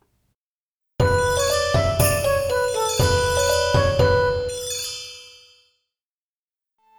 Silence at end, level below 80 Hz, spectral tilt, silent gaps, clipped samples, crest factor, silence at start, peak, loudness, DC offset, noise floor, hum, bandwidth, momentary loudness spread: 1.7 s; -36 dBFS; -4 dB/octave; none; under 0.1%; 18 dB; 1 s; -4 dBFS; -20 LUFS; under 0.1%; under -90 dBFS; none; over 20 kHz; 8 LU